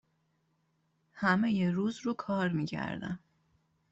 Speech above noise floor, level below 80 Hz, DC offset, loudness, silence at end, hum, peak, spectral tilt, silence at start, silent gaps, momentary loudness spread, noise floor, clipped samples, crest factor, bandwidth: 44 dB; -68 dBFS; under 0.1%; -32 LUFS; 0.75 s; none; -14 dBFS; -7 dB/octave; 1.15 s; none; 11 LU; -75 dBFS; under 0.1%; 20 dB; 8 kHz